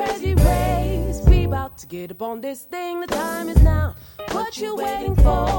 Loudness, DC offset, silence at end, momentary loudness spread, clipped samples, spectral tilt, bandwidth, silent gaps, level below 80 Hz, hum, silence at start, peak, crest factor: -21 LUFS; under 0.1%; 0 s; 13 LU; under 0.1%; -6.5 dB/octave; 17 kHz; none; -22 dBFS; none; 0 s; -2 dBFS; 18 dB